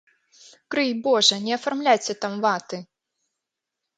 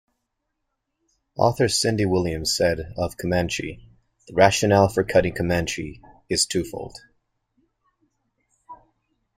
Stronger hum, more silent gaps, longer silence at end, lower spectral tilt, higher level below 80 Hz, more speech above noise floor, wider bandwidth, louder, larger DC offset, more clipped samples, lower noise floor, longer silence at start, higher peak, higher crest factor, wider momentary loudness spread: neither; neither; first, 1.15 s vs 0.65 s; second, -2.5 dB/octave vs -4.5 dB/octave; second, -76 dBFS vs -48 dBFS; first, 62 dB vs 56 dB; second, 9.6 kHz vs 16 kHz; about the same, -22 LUFS vs -22 LUFS; neither; neither; first, -84 dBFS vs -78 dBFS; second, 0.7 s vs 1.35 s; about the same, -4 dBFS vs -2 dBFS; about the same, 20 dB vs 22 dB; second, 11 LU vs 14 LU